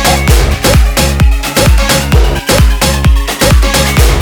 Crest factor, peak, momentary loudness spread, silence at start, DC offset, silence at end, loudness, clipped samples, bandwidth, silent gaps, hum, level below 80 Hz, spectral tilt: 8 dB; 0 dBFS; 2 LU; 0 s; under 0.1%; 0 s; -9 LUFS; 0.8%; over 20 kHz; none; none; -10 dBFS; -4 dB/octave